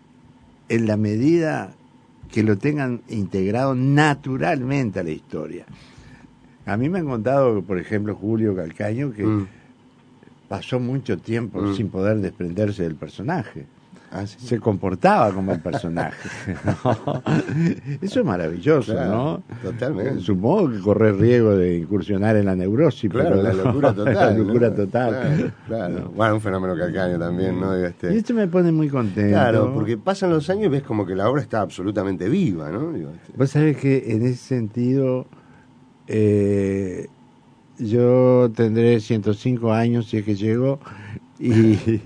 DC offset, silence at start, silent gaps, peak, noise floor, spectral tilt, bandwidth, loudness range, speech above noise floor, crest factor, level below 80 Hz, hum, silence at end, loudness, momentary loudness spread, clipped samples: under 0.1%; 0.7 s; none; -2 dBFS; -52 dBFS; -8 dB/octave; 10 kHz; 6 LU; 32 dB; 18 dB; -54 dBFS; none; 0 s; -21 LUFS; 11 LU; under 0.1%